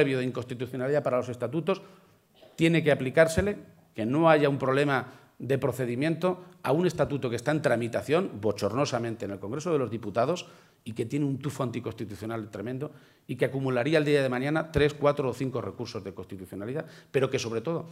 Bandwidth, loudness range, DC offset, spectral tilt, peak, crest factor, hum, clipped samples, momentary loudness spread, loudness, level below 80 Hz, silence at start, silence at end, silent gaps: 16 kHz; 6 LU; under 0.1%; -6.5 dB/octave; -6 dBFS; 22 dB; none; under 0.1%; 13 LU; -28 LUFS; -54 dBFS; 0 s; 0 s; none